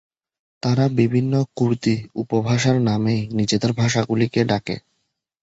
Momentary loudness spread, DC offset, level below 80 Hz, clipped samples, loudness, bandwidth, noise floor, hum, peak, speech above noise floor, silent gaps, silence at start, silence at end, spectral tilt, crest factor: 6 LU; under 0.1%; -52 dBFS; under 0.1%; -20 LUFS; 8 kHz; -74 dBFS; none; -4 dBFS; 54 dB; none; 0.65 s; 0.65 s; -6 dB/octave; 16 dB